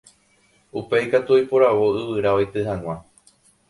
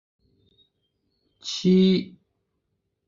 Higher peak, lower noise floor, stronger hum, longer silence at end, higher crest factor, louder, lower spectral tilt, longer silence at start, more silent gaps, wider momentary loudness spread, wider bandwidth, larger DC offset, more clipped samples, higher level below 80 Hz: first, -4 dBFS vs -10 dBFS; second, -60 dBFS vs -77 dBFS; neither; second, 0.7 s vs 1 s; about the same, 16 dB vs 16 dB; about the same, -20 LUFS vs -21 LUFS; about the same, -7 dB/octave vs -6.5 dB/octave; second, 0.75 s vs 1.45 s; neither; second, 16 LU vs 19 LU; first, 11.5 kHz vs 7.4 kHz; neither; neither; first, -52 dBFS vs -64 dBFS